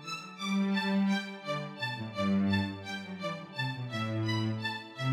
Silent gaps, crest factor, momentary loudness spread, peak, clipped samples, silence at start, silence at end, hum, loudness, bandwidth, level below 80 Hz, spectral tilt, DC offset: none; 16 dB; 9 LU; -16 dBFS; under 0.1%; 0 s; 0 s; none; -33 LUFS; 12 kHz; -74 dBFS; -6 dB/octave; under 0.1%